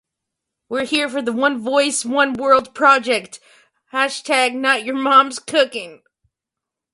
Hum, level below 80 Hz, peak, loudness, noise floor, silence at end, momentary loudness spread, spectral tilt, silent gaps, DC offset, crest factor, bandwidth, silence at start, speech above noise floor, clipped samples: none; -64 dBFS; 0 dBFS; -17 LUFS; -85 dBFS; 1 s; 9 LU; -2 dB/octave; none; under 0.1%; 18 dB; 11.5 kHz; 0.7 s; 67 dB; under 0.1%